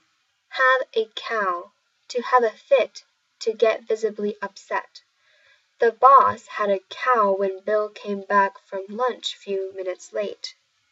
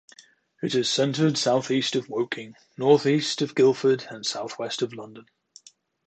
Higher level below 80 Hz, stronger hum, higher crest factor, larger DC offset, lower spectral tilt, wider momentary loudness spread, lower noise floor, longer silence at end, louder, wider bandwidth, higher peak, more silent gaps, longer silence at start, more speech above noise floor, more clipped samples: second, -80 dBFS vs -72 dBFS; neither; about the same, 22 dB vs 20 dB; neither; about the same, -3.5 dB/octave vs -4.5 dB/octave; about the same, 13 LU vs 12 LU; first, -68 dBFS vs -54 dBFS; second, 0.4 s vs 0.85 s; about the same, -22 LUFS vs -24 LUFS; second, 8 kHz vs 9 kHz; first, -2 dBFS vs -6 dBFS; neither; about the same, 0.5 s vs 0.6 s; first, 46 dB vs 30 dB; neither